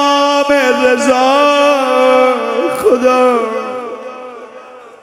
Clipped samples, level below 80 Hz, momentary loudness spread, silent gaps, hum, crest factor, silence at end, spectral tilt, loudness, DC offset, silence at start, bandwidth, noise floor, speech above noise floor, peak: under 0.1%; -54 dBFS; 17 LU; none; none; 12 dB; 0.15 s; -2.5 dB/octave; -11 LUFS; under 0.1%; 0 s; 16 kHz; -34 dBFS; 24 dB; 0 dBFS